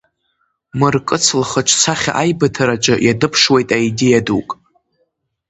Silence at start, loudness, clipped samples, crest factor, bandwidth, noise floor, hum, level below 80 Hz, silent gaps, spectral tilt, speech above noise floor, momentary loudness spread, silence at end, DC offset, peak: 0.75 s; -14 LUFS; under 0.1%; 16 dB; 9 kHz; -66 dBFS; none; -48 dBFS; none; -3.5 dB/octave; 52 dB; 8 LU; 0.95 s; under 0.1%; 0 dBFS